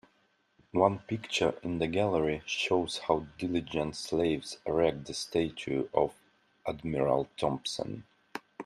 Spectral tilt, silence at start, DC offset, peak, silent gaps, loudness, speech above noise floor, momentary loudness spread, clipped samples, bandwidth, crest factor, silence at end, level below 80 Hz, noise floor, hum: -5 dB/octave; 0.75 s; under 0.1%; -10 dBFS; none; -31 LUFS; 40 dB; 9 LU; under 0.1%; 13.5 kHz; 22 dB; 0 s; -58 dBFS; -71 dBFS; none